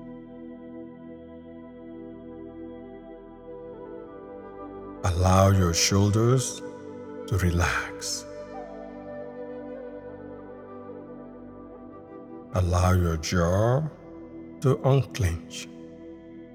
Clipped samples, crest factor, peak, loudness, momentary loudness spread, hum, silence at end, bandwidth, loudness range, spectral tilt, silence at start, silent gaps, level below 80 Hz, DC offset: under 0.1%; 22 dB; -6 dBFS; -25 LUFS; 22 LU; none; 0 s; 16 kHz; 18 LU; -5 dB/octave; 0 s; none; -44 dBFS; under 0.1%